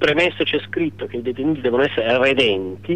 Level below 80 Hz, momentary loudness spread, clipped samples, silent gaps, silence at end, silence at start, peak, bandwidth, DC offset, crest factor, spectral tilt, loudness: -52 dBFS; 9 LU; under 0.1%; none; 0 s; 0 s; -6 dBFS; 9.6 kHz; 0.5%; 14 dB; -5.5 dB/octave; -19 LUFS